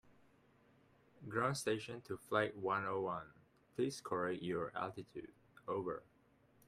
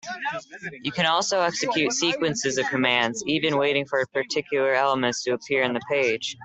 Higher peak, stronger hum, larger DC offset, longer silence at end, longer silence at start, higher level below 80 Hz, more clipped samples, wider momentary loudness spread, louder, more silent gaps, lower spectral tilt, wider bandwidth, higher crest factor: second, -20 dBFS vs -6 dBFS; neither; neither; first, 0.65 s vs 0 s; about the same, 0.1 s vs 0.05 s; second, -76 dBFS vs -64 dBFS; neither; first, 15 LU vs 9 LU; second, -41 LUFS vs -23 LUFS; neither; first, -5 dB/octave vs -3 dB/octave; first, 15 kHz vs 8.4 kHz; about the same, 22 dB vs 18 dB